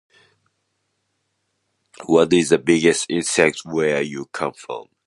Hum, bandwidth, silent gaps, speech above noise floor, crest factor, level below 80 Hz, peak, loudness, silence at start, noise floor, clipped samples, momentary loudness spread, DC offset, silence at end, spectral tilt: none; 11.5 kHz; none; 54 dB; 20 dB; -58 dBFS; 0 dBFS; -19 LUFS; 2 s; -72 dBFS; under 0.1%; 12 LU; under 0.1%; 0.25 s; -4 dB/octave